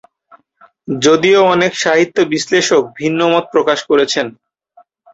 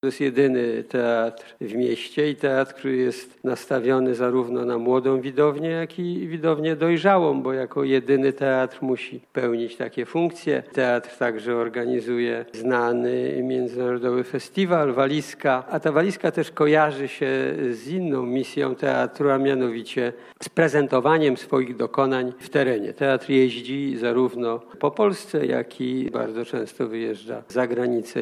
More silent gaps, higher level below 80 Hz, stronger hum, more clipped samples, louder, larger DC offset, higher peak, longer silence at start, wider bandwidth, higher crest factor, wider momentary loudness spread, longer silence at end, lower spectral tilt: neither; first, -58 dBFS vs -74 dBFS; neither; neither; first, -13 LUFS vs -23 LUFS; neither; first, 0 dBFS vs -4 dBFS; first, 0.9 s vs 0.05 s; second, 8 kHz vs 13 kHz; about the same, 14 dB vs 18 dB; about the same, 7 LU vs 8 LU; first, 0.85 s vs 0 s; second, -3.5 dB/octave vs -6.5 dB/octave